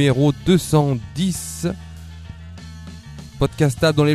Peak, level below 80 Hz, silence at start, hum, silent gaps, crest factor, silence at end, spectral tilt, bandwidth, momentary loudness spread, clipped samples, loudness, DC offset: 0 dBFS; -40 dBFS; 0 s; none; none; 18 dB; 0 s; -6 dB/octave; 14 kHz; 21 LU; under 0.1%; -19 LUFS; under 0.1%